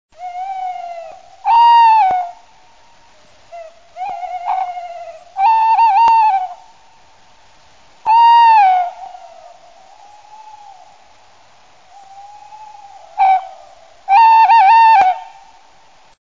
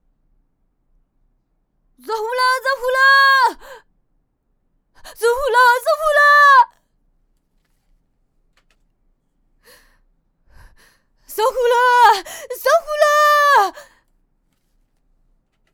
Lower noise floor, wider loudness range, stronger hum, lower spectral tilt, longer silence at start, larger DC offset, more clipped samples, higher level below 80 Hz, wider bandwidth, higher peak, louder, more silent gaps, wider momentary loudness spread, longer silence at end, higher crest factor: second, -48 dBFS vs -66 dBFS; first, 10 LU vs 4 LU; neither; first, -1 dB/octave vs 0.5 dB/octave; second, 0.2 s vs 2.05 s; first, 0.4% vs under 0.1%; neither; second, -62 dBFS vs -52 dBFS; second, 7.4 kHz vs over 20 kHz; about the same, -2 dBFS vs -4 dBFS; first, -11 LUFS vs -14 LUFS; neither; first, 22 LU vs 12 LU; second, 1 s vs 1.95 s; about the same, 12 dB vs 16 dB